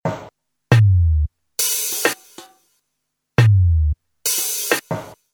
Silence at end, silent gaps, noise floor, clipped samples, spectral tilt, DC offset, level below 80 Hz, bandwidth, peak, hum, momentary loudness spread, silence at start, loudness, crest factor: 0.2 s; none; -76 dBFS; under 0.1%; -4 dB/octave; under 0.1%; -30 dBFS; 19.5 kHz; 0 dBFS; none; 13 LU; 0.05 s; -18 LUFS; 18 dB